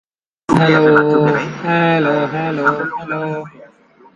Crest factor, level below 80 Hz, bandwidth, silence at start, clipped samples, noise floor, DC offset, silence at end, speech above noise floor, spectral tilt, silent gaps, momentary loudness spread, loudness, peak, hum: 16 dB; -50 dBFS; 10.5 kHz; 0.5 s; under 0.1%; -47 dBFS; under 0.1%; 0.5 s; 32 dB; -7 dB/octave; none; 13 LU; -15 LUFS; 0 dBFS; none